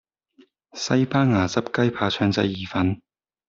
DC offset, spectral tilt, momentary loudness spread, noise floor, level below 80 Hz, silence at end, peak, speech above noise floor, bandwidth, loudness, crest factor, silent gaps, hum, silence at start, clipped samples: under 0.1%; -6 dB/octave; 9 LU; -58 dBFS; -58 dBFS; 0.55 s; -6 dBFS; 36 dB; 7.6 kHz; -22 LUFS; 18 dB; none; none; 0.75 s; under 0.1%